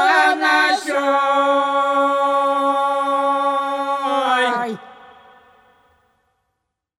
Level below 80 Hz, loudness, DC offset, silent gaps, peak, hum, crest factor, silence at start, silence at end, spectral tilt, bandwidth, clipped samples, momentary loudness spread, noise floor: -74 dBFS; -17 LUFS; under 0.1%; none; -2 dBFS; none; 16 dB; 0 s; 2.05 s; -2.5 dB/octave; 14 kHz; under 0.1%; 6 LU; -76 dBFS